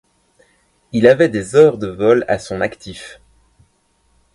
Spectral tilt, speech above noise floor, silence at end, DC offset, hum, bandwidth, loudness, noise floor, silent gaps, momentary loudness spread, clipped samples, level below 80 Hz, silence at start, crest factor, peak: -6 dB/octave; 46 dB; 1.2 s; under 0.1%; none; 11.5 kHz; -15 LUFS; -60 dBFS; none; 21 LU; under 0.1%; -50 dBFS; 0.95 s; 18 dB; 0 dBFS